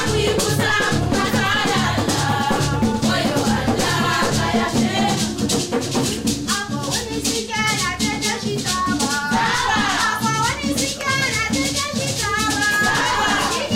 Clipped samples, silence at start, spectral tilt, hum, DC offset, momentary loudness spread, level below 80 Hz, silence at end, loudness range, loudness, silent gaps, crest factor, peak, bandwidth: under 0.1%; 0 s; -3.5 dB/octave; none; 0.2%; 4 LU; -38 dBFS; 0 s; 2 LU; -19 LUFS; none; 12 dB; -8 dBFS; 16 kHz